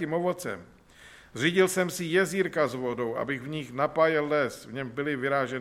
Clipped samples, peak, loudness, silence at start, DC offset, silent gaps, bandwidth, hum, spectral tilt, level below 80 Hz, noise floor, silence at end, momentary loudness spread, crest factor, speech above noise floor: under 0.1%; -10 dBFS; -28 LUFS; 0 s; under 0.1%; none; 16 kHz; none; -5 dB/octave; -64 dBFS; -53 dBFS; 0 s; 11 LU; 18 dB; 25 dB